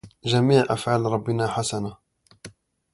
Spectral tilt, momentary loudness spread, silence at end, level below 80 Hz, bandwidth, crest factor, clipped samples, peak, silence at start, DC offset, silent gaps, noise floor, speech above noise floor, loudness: -5.5 dB/octave; 10 LU; 0.45 s; -56 dBFS; 11.5 kHz; 20 dB; under 0.1%; -4 dBFS; 0.05 s; under 0.1%; none; -47 dBFS; 25 dB; -23 LUFS